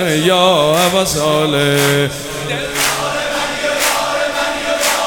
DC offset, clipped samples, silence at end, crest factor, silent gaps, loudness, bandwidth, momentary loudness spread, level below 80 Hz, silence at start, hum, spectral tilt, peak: 0.3%; under 0.1%; 0 s; 14 dB; none; -14 LUFS; over 20 kHz; 7 LU; -42 dBFS; 0 s; none; -3 dB/octave; 0 dBFS